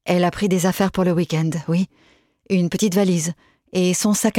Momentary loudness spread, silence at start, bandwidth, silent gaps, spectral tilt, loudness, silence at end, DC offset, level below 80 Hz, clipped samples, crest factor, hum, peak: 7 LU; 0.05 s; 17 kHz; none; -5.5 dB/octave; -20 LUFS; 0 s; under 0.1%; -52 dBFS; under 0.1%; 16 dB; none; -4 dBFS